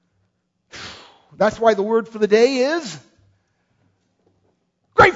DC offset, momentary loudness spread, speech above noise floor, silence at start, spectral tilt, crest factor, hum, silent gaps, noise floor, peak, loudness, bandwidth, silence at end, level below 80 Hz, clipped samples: under 0.1%; 21 LU; 52 dB; 0.75 s; -4.5 dB/octave; 20 dB; none; none; -69 dBFS; 0 dBFS; -18 LUFS; 8 kHz; 0 s; -50 dBFS; under 0.1%